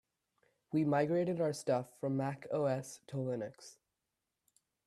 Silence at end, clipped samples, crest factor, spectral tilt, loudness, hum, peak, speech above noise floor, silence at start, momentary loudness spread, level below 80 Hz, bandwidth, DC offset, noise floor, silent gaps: 1.15 s; under 0.1%; 18 dB; -7 dB/octave; -36 LUFS; none; -20 dBFS; 53 dB; 0.7 s; 12 LU; -80 dBFS; 13 kHz; under 0.1%; -88 dBFS; none